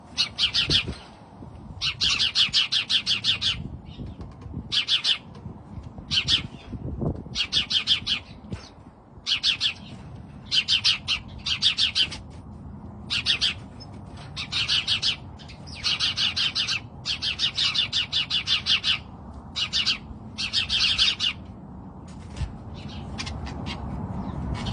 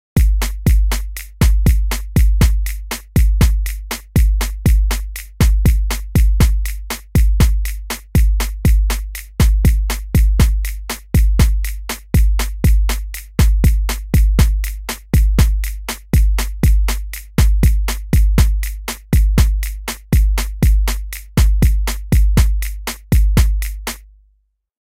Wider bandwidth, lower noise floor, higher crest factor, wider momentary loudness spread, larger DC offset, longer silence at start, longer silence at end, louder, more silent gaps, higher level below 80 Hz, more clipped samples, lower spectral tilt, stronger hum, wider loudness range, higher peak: second, 10.5 kHz vs 16 kHz; second, -48 dBFS vs -61 dBFS; first, 20 dB vs 14 dB; first, 21 LU vs 10 LU; second, under 0.1% vs 0.4%; second, 0 s vs 0.15 s; second, 0 s vs 0.9 s; second, -23 LUFS vs -17 LUFS; neither; second, -46 dBFS vs -16 dBFS; neither; second, -2 dB/octave vs -5.5 dB/octave; neither; about the same, 3 LU vs 1 LU; second, -8 dBFS vs 0 dBFS